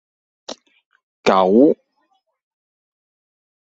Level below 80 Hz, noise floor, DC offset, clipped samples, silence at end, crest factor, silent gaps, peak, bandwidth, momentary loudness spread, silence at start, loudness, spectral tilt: -62 dBFS; -67 dBFS; under 0.1%; under 0.1%; 1.9 s; 20 dB; 0.86-0.91 s, 1.03-1.23 s; -2 dBFS; 8 kHz; 23 LU; 0.5 s; -16 LUFS; -6 dB/octave